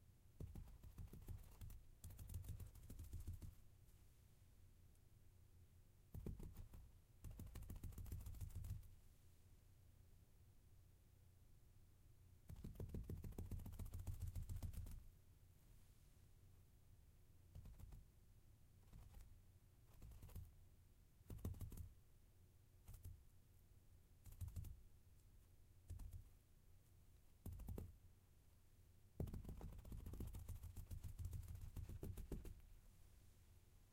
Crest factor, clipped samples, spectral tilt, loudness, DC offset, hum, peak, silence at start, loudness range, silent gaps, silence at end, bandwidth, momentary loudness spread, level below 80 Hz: 24 dB; under 0.1%; -6.5 dB/octave; -58 LUFS; under 0.1%; none; -34 dBFS; 0 s; 11 LU; none; 0 s; 16 kHz; 12 LU; -62 dBFS